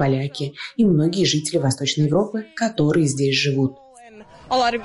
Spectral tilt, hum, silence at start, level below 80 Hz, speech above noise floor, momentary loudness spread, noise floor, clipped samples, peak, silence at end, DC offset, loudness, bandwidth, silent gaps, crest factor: -5 dB/octave; none; 0 s; -54 dBFS; 25 dB; 8 LU; -44 dBFS; under 0.1%; -6 dBFS; 0 s; under 0.1%; -20 LUFS; 11.5 kHz; none; 14 dB